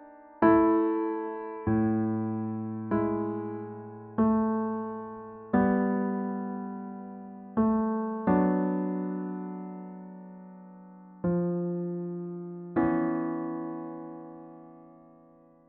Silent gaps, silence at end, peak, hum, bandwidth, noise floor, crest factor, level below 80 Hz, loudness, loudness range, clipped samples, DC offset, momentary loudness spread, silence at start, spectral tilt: none; 0.75 s; -10 dBFS; none; 3.2 kHz; -57 dBFS; 20 dB; -58 dBFS; -29 LUFS; 5 LU; under 0.1%; under 0.1%; 19 LU; 0 s; -9.5 dB/octave